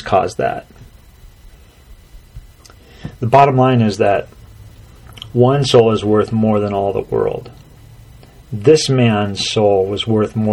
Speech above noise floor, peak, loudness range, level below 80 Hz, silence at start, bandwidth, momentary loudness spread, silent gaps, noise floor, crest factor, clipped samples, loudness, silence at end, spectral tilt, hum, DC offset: 28 dB; 0 dBFS; 4 LU; -42 dBFS; 0 s; 12 kHz; 12 LU; none; -42 dBFS; 16 dB; under 0.1%; -14 LUFS; 0 s; -6 dB/octave; none; under 0.1%